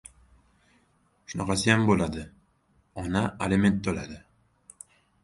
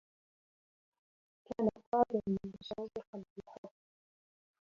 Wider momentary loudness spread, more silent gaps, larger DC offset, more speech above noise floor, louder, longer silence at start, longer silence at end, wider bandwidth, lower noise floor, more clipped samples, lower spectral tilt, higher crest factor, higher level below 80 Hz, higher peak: first, 25 LU vs 21 LU; second, none vs 1.87-1.92 s, 3.07-3.13 s, 3.30-3.36 s, 3.58-3.63 s; neither; second, 41 dB vs over 50 dB; first, -26 LUFS vs -37 LUFS; second, 1.3 s vs 1.5 s; about the same, 1.05 s vs 1.1 s; first, 11.5 kHz vs 7.2 kHz; second, -67 dBFS vs under -90 dBFS; neither; about the same, -5.5 dB/octave vs -6.5 dB/octave; about the same, 22 dB vs 24 dB; first, -48 dBFS vs -70 dBFS; first, -6 dBFS vs -16 dBFS